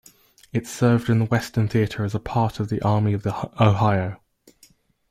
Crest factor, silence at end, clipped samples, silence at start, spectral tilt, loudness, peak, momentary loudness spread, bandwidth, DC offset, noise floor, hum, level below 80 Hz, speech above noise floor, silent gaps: 18 dB; 0.95 s; under 0.1%; 0.55 s; -7 dB/octave; -22 LUFS; -4 dBFS; 10 LU; 15 kHz; under 0.1%; -57 dBFS; none; -50 dBFS; 36 dB; none